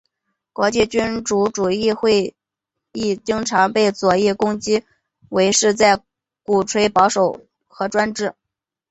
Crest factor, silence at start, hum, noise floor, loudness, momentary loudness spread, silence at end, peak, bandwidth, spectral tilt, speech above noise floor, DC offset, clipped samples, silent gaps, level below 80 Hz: 18 dB; 0.6 s; none; -83 dBFS; -18 LUFS; 10 LU; 0.6 s; 0 dBFS; 8.2 kHz; -3.5 dB/octave; 66 dB; under 0.1%; under 0.1%; none; -52 dBFS